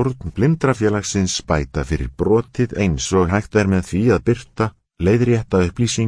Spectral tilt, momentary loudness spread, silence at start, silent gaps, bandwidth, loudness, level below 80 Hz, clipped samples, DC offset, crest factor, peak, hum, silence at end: -6 dB/octave; 6 LU; 0 s; none; 11 kHz; -19 LUFS; -34 dBFS; under 0.1%; under 0.1%; 16 dB; -2 dBFS; none; 0 s